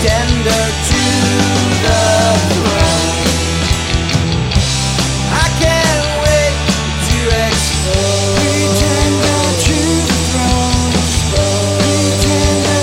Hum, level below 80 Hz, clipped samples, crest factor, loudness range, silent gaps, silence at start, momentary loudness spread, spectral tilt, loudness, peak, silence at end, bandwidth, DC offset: none; -22 dBFS; under 0.1%; 12 dB; 1 LU; none; 0 s; 3 LU; -4 dB/octave; -12 LUFS; 0 dBFS; 0 s; 16.5 kHz; under 0.1%